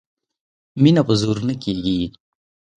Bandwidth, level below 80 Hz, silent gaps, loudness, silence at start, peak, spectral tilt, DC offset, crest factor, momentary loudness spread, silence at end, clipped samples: 10 kHz; -48 dBFS; none; -19 LUFS; 0.75 s; -2 dBFS; -7 dB/octave; under 0.1%; 20 dB; 11 LU; 0.7 s; under 0.1%